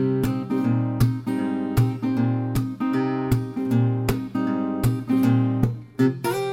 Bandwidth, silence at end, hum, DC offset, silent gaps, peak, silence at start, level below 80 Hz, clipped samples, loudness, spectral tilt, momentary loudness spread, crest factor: 16 kHz; 0 s; none; under 0.1%; none; -6 dBFS; 0 s; -42 dBFS; under 0.1%; -23 LUFS; -8 dB/octave; 5 LU; 16 dB